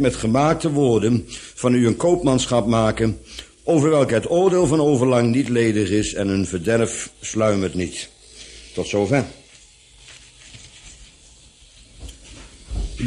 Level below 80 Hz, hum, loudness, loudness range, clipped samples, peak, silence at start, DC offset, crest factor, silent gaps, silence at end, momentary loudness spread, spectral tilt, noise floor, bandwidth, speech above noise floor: -40 dBFS; none; -19 LUFS; 10 LU; under 0.1%; -4 dBFS; 0 s; under 0.1%; 16 dB; none; 0 s; 17 LU; -5.5 dB/octave; -49 dBFS; 11.5 kHz; 30 dB